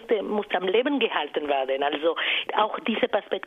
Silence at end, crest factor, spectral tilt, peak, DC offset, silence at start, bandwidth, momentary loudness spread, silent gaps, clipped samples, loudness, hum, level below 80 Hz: 0.05 s; 18 dB; -6 dB/octave; -8 dBFS; under 0.1%; 0 s; 5.4 kHz; 3 LU; none; under 0.1%; -25 LUFS; none; -68 dBFS